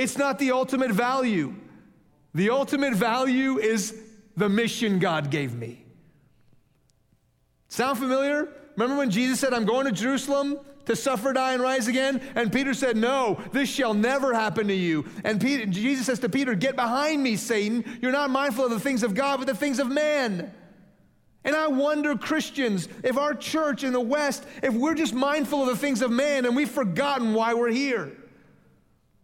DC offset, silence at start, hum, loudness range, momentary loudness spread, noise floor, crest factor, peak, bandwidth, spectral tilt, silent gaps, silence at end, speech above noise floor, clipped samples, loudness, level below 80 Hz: under 0.1%; 0 s; none; 3 LU; 5 LU; -67 dBFS; 16 dB; -10 dBFS; 16.5 kHz; -4.5 dB/octave; none; 1 s; 42 dB; under 0.1%; -25 LUFS; -66 dBFS